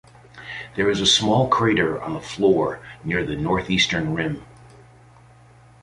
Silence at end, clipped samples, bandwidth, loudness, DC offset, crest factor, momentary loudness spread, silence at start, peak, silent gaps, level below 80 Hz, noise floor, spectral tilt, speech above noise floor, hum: 1.35 s; under 0.1%; 11.5 kHz; -21 LUFS; under 0.1%; 18 dB; 16 LU; 0.35 s; -4 dBFS; none; -48 dBFS; -50 dBFS; -4 dB/octave; 29 dB; none